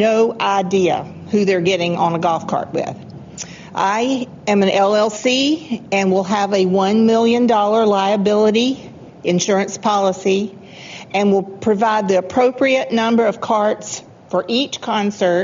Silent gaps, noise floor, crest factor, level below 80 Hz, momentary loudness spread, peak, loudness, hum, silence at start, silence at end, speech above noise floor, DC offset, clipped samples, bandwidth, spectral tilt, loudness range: none; -35 dBFS; 12 dB; -58 dBFS; 11 LU; -4 dBFS; -17 LUFS; none; 0 s; 0 s; 19 dB; under 0.1%; under 0.1%; 7.6 kHz; -4 dB/octave; 4 LU